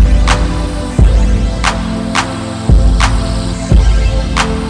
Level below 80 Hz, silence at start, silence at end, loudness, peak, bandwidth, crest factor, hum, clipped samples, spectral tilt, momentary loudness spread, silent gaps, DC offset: -12 dBFS; 0 s; 0 s; -13 LUFS; 0 dBFS; 10.5 kHz; 10 dB; none; under 0.1%; -5.5 dB/octave; 7 LU; none; under 0.1%